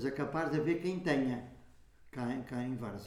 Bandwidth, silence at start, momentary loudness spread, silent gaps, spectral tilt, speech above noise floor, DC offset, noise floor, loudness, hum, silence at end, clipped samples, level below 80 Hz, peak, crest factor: 14 kHz; 0 s; 10 LU; none; -7 dB/octave; 23 dB; under 0.1%; -58 dBFS; -36 LUFS; none; 0 s; under 0.1%; -64 dBFS; -18 dBFS; 18 dB